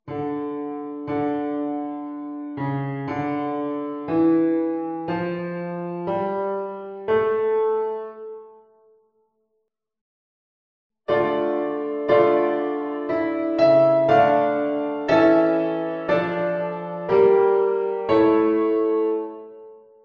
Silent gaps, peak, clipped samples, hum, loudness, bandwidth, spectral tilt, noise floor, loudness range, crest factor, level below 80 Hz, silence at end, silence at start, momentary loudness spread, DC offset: 10.01-10.90 s; -4 dBFS; under 0.1%; none; -22 LUFS; 6.6 kHz; -8.5 dB/octave; -75 dBFS; 9 LU; 18 dB; -62 dBFS; 0.25 s; 0.05 s; 14 LU; under 0.1%